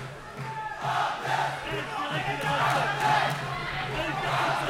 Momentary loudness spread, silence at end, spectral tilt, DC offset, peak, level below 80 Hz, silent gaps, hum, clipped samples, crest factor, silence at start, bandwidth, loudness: 10 LU; 0 s; -4 dB/octave; under 0.1%; -12 dBFS; -52 dBFS; none; none; under 0.1%; 16 dB; 0 s; 16.5 kHz; -28 LUFS